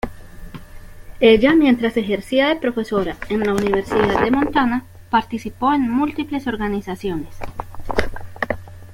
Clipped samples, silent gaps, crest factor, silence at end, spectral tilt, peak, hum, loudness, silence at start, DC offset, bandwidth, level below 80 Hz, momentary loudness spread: under 0.1%; none; 18 dB; 0 s; -6 dB/octave; -2 dBFS; none; -19 LUFS; 0.05 s; under 0.1%; 16.5 kHz; -38 dBFS; 18 LU